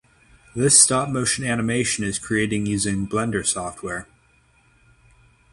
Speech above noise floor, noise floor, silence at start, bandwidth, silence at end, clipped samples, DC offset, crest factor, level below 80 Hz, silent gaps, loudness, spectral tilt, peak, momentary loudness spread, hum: 37 dB; -59 dBFS; 0.55 s; 13.5 kHz; 1.5 s; under 0.1%; under 0.1%; 24 dB; -50 dBFS; none; -20 LUFS; -3 dB/octave; 0 dBFS; 17 LU; none